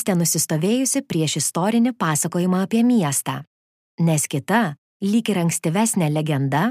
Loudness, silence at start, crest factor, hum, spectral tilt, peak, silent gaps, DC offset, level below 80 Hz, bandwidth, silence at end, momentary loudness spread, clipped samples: -20 LUFS; 0 s; 14 dB; none; -4.5 dB/octave; -6 dBFS; 3.47-3.98 s, 4.78-5.00 s; under 0.1%; -66 dBFS; 15.5 kHz; 0 s; 4 LU; under 0.1%